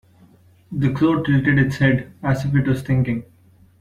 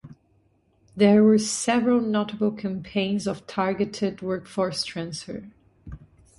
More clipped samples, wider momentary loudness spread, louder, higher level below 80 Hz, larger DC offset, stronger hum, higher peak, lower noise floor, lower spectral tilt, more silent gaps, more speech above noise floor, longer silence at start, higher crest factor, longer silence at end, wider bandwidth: neither; second, 7 LU vs 20 LU; first, -19 LUFS vs -24 LUFS; first, -44 dBFS vs -56 dBFS; neither; neither; about the same, -4 dBFS vs -6 dBFS; second, -51 dBFS vs -64 dBFS; first, -8 dB/octave vs -5 dB/octave; neither; second, 33 dB vs 41 dB; first, 0.7 s vs 0.05 s; about the same, 16 dB vs 18 dB; first, 0.6 s vs 0.45 s; about the same, 10.5 kHz vs 11.5 kHz